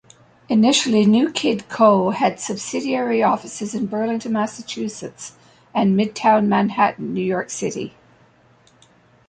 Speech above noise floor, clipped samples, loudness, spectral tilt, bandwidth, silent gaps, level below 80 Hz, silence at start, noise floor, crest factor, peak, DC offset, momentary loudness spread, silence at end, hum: 35 dB; under 0.1%; -19 LUFS; -5 dB/octave; 9.4 kHz; none; -62 dBFS; 0.5 s; -54 dBFS; 18 dB; -2 dBFS; under 0.1%; 12 LU; 1.4 s; none